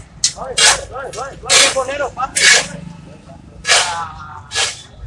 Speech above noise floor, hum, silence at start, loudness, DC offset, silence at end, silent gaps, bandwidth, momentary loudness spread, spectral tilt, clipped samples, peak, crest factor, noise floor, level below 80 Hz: 22 dB; none; 0 s; -13 LUFS; under 0.1%; 0 s; none; 12 kHz; 17 LU; 0.5 dB/octave; under 0.1%; 0 dBFS; 18 dB; -37 dBFS; -44 dBFS